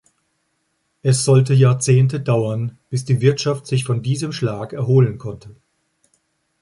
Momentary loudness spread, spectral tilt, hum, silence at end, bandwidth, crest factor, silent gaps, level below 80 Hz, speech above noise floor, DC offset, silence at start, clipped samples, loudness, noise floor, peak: 11 LU; -6 dB/octave; none; 1.1 s; 11.5 kHz; 16 dB; none; -54 dBFS; 52 dB; under 0.1%; 1.05 s; under 0.1%; -18 LUFS; -69 dBFS; -2 dBFS